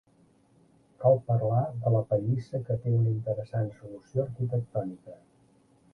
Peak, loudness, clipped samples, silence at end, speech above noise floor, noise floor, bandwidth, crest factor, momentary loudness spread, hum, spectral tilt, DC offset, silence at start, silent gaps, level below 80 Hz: -10 dBFS; -29 LUFS; under 0.1%; 0.8 s; 35 dB; -63 dBFS; 4.8 kHz; 18 dB; 10 LU; none; -11 dB/octave; under 0.1%; 1 s; none; -62 dBFS